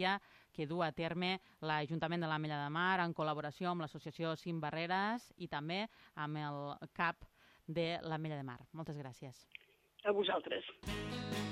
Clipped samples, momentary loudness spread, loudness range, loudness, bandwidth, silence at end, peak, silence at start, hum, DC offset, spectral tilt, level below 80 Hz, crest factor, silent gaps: under 0.1%; 13 LU; 5 LU; -40 LUFS; 14.5 kHz; 0 s; -22 dBFS; 0 s; none; under 0.1%; -6 dB/octave; -66 dBFS; 18 dB; none